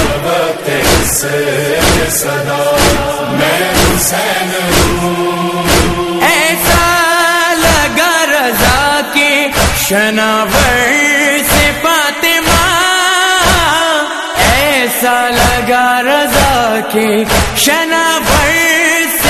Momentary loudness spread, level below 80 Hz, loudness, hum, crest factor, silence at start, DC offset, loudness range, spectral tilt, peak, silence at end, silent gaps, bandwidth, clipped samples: 5 LU; -24 dBFS; -10 LUFS; none; 10 dB; 0 s; under 0.1%; 2 LU; -3 dB/octave; 0 dBFS; 0 s; none; 14 kHz; under 0.1%